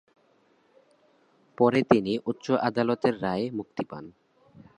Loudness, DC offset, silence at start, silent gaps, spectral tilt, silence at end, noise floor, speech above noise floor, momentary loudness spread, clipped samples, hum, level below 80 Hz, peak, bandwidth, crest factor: -26 LUFS; under 0.1%; 1.6 s; none; -7 dB/octave; 0.65 s; -65 dBFS; 39 dB; 13 LU; under 0.1%; none; -64 dBFS; -2 dBFS; 10.5 kHz; 26 dB